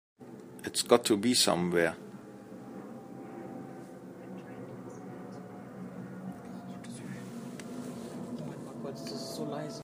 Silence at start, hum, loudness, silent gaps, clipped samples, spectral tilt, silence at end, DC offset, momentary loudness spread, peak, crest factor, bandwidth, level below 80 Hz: 0.2 s; none; -33 LUFS; none; under 0.1%; -3.5 dB/octave; 0 s; under 0.1%; 21 LU; -8 dBFS; 28 dB; 15.5 kHz; -76 dBFS